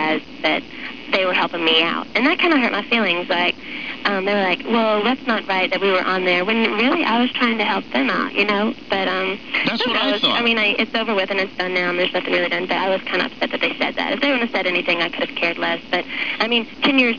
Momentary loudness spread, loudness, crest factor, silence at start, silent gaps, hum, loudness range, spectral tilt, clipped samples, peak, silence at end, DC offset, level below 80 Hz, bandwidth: 6 LU; -18 LUFS; 16 dB; 0 s; none; none; 2 LU; -5 dB/octave; under 0.1%; -4 dBFS; 0 s; 0.8%; -56 dBFS; 5.4 kHz